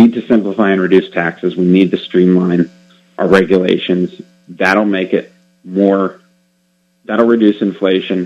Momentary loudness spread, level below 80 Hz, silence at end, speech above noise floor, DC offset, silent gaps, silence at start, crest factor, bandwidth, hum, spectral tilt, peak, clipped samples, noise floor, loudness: 8 LU; -54 dBFS; 0 s; 47 dB; under 0.1%; none; 0 s; 14 dB; 8.4 kHz; none; -7.5 dB/octave; 0 dBFS; 0.2%; -59 dBFS; -13 LUFS